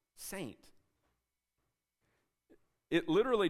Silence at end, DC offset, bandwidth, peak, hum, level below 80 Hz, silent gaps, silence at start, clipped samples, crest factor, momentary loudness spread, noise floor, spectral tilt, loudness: 0 s; under 0.1%; 15.5 kHz; -18 dBFS; none; -66 dBFS; none; 0.2 s; under 0.1%; 20 dB; 15 LU; -86 dBFS; -5 dB/octave; -35 LUFS